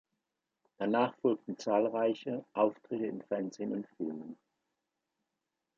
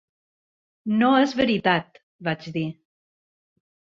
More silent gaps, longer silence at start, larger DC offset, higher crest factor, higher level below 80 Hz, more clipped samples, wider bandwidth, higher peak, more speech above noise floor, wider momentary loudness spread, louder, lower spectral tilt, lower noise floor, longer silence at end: second, none vs 2.03-2.19 s; about the same, 0.8 s vs 0.85 s; neither; about the same, 20 dB vs 20 dB; second, -84 dBFS vs -62 dBFS; neither; about the same, 7.4 kHz vs 7.4 kHz; second, -16 dBFS vs -4 dBFS; second, 54 dB vs over 68 dB; second, 10 LU vs 13 LU; second, -34 LUFS vs -23 LUFS; about the same, -6.5 dB/octave vs -6.5 dB/octave; about the same, -87 dBFS vs under -90 dBFS; first, 1.45 s vs 1.2 s